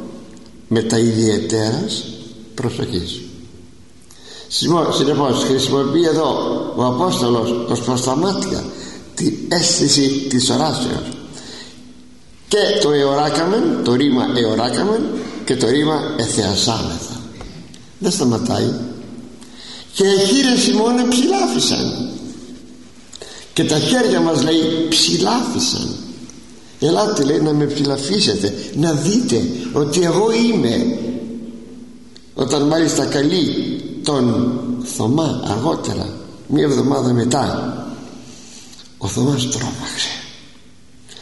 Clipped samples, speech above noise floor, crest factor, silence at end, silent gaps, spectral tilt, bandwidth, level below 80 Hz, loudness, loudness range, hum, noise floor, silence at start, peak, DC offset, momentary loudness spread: under 0.1%; 30 dB; 16 dB; 0 s; none; -4.5 dB/octave; 11.5 kHz; -48 dBFS; -17 LUFS; 4 LU; none; -47 dBFS; 0 s; -2 dBFS; 0.7%; 19 LU